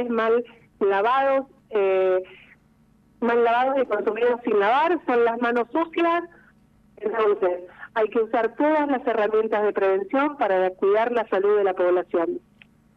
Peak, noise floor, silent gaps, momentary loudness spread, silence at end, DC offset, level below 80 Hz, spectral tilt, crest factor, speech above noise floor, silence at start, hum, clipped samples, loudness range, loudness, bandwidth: -10 dBFS; -58 dBFS; none; 7 LU; 0.6 s; under 0.1%; -66 dBFS; -6.5 dB/octave; 12 dB; 37 dB; 0 s; 50 Hz at -65 dBFS; under 0.1%; 2 LU; -22 LUFS; 6 kHz